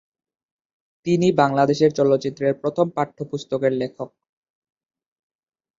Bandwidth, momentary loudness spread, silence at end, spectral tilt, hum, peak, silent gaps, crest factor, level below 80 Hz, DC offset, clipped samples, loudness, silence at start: 7.8 kHz; 13 LU; 1.7 s; -6.5 dB/octave; none; -2 dBFS; none; 20 dB; -64 dBFS; under 0.1%; under 0.1%; -21 LUFS; 1.05 s